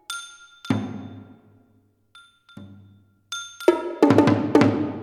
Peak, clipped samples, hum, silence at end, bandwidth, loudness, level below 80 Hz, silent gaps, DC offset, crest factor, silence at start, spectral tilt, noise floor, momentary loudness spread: -2 dBFS; under 0.1%; none; 0 s; 14 kHz; -21 LUFS; -64 dBFS; none; under 0.1%; 22 dB; 0.1 s; -6.5 dB/octave; -62 dBFS; 22 LU